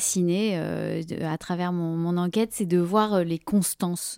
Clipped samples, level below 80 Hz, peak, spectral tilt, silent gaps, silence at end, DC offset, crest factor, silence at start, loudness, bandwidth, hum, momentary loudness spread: under 0.1%; -60 dBFS; -8 dBFS; -5.5 dB/octave; none; 0 s; under 0.1%; 16 dB; 0 s; -25 LUFS; 17 kHz; none; 7 LU